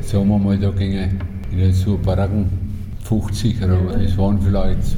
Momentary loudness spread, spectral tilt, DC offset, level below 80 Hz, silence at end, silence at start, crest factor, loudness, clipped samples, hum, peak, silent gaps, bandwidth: 7 LU; -8 dB/octave; under 0.1%; -26 dBFS; 0 s; 0 s; 12 dB; -19 LUFS; under 0.1%; none; -4 dBFS; none; 14 kHz